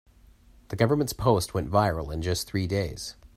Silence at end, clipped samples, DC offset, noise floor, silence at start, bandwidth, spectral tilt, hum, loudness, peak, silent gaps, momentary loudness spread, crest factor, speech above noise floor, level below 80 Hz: 0.1 s; under 0.1%; under 0.1%; -55 dBFS; 0.7 s; 16 kHz; -5.5 dB/octave; none; -26 LUFS; -6 dBFS; none; 8 LU; 20 dB; 29 dB; -46 dBFS